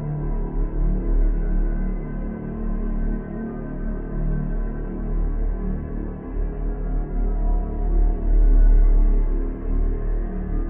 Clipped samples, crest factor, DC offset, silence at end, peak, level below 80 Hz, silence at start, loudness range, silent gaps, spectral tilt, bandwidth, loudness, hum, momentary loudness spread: under 0.1%; 12 dB; under 0.1%; 0 s; -8 dBFS; -20 dBFS; 0 s; 6 LU; none; -13.5 dB/octave; 2.2 kHz; -26 LUFS; none; 9 LU